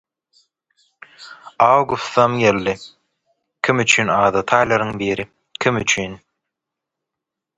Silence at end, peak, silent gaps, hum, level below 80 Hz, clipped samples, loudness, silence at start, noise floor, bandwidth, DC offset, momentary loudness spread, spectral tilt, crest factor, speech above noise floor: 1.4 s; 0 dBFS; none; none; -52 dBFS; under 0.1%; -17 LUFS; 1.2 s; -83 dBFS; 11 kHz; under 0.1%; 16 LU; -4 dB/octave; 20 dB; 67 dB